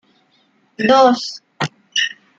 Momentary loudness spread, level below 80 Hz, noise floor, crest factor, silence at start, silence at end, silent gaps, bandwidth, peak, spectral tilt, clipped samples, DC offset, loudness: 14 LU; -62 dBFS; -59 dBFS; 16 dB; 0.8 s; 0.3 s; none; 7.8 kHz; -2 dBFS; -3.5 dB/octave; under 0.1%; under 0.1%; -16 LUFS